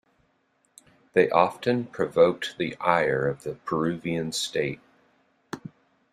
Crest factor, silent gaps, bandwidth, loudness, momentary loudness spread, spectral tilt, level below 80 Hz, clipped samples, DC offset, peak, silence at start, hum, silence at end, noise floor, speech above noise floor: 22 dB; none; 14 kHz; -25 LUFS; 19 LU; -5 dB/octave; -62 dBFS; under 0.1%; under 0.1%; -4 dBFS; 1.15 s; none; 0.55 s; -69 dBFS; 45 dB